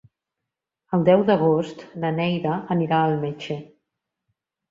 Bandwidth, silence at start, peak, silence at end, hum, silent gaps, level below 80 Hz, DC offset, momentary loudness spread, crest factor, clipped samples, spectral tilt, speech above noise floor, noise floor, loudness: 7.6 kHz; 0.9 s; -4 dBFS; 1.05 s; none; none; -64 dBFS; under 0.1%; 14 LU; 20 dB; under 0.1%; -8.5 dB/octave; 63 dB; -85 dBFS; -22 LUFS